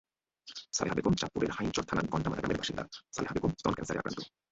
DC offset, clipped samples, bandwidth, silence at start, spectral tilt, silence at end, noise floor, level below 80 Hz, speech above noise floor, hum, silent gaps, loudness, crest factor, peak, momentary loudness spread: under 0.1%; under 0.1%; 8.2 kHz; 0.45 s; -4.5 dB/octave; 0.25 s; -56 dBFS; -54 dBFS; 23 dB; none; none; -34 LUFS; 20 dB; -14 dBFS; 10 LU